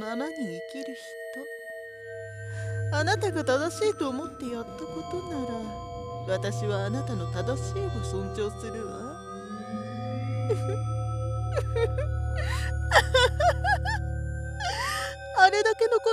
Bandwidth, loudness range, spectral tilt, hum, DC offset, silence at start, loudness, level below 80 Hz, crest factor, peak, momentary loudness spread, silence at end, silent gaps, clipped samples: 14.5 kHz; 7 LU; -5 dB/octave; none; under 0.1%; 0 s; -28 LUFS; -38 dBFS; 24 dB; -4 dBFS; 16 LU; 0 s; none; under 0.1%